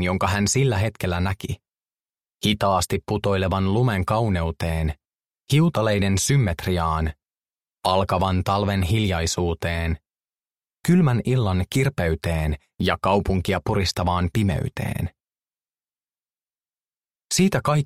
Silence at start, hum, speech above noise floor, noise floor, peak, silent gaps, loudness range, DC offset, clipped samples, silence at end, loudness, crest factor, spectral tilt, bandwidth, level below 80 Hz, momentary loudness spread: 0 s; none; over 69 dB; under -90 dBFS; -4 dBFS; 5.15-5.19 s, 17.24-17.28 s; 4 LU; under 0.1%; under 0.1%; 0 s; -22 LUFS; 18 dB; -5.5 dB/octave; 15.5 kHz; -38 dBFS; 8 LU